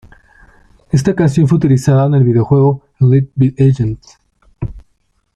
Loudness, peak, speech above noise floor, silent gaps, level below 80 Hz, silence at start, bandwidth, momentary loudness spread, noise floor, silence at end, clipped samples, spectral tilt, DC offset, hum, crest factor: -12 LUFS; -2 dBFS; 49 dB; none; -38 dBFS; 0.95 s; 10.5 kHz; 16 LU; -60 dBFS; 0.55 s; under 0.1%; -8.5 dB/octave; under 0.1%; none; 12 dB